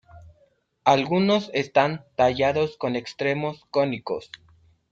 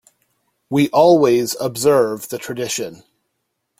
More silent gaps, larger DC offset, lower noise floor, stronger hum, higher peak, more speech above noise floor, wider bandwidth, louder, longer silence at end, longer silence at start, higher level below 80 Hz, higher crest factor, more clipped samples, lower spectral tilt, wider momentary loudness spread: neither; neither; second, -64 dBFS vs -73 dBFS; neither; about the same, -4 dBFS vs -2 dBFS; second, 41 dB vs 57 dB; second, 7.8 kHz vs 16.5 kHz; second, -24 LUFS vs -17 LUFS; second, 0.7 s vs 0.85 s; second, 0.15 s vs 0.7 s; about the same, -60 dBFS vs -60 dBFS; about the same, 20 dB vs 16 dB; neither; about the same, -6 dB/octave vs -5 dB/octave; second, 9 LU vs 14 LU